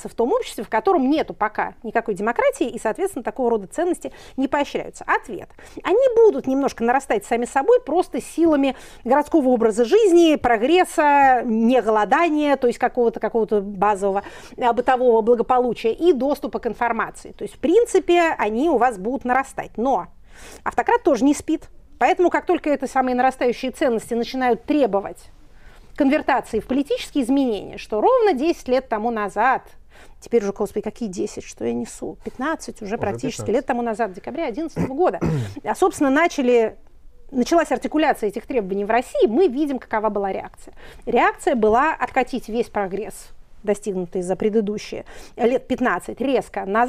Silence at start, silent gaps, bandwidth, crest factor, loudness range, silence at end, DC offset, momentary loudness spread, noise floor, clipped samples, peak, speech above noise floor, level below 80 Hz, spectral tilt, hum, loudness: 0 s; none; 15 kHz; 14 dB; 7 LU; 0 s; under 0.1%; 10 LU; -44 dBFS; under 0.1%; -6 dBFS; 24 dB; -46 dBFS; -5.5 dB/octave; none; -20 LUFS